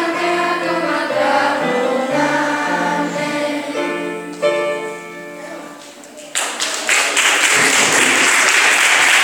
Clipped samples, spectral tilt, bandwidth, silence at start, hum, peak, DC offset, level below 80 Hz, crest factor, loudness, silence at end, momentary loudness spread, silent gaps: under 0.1%; -1 dB/octave; 19.5 kHz; 0 s; none; 0 dBFS; under 0.1%; -70 dBFS; 16 dB; -14 LUFS; 0 s; 20 LU; none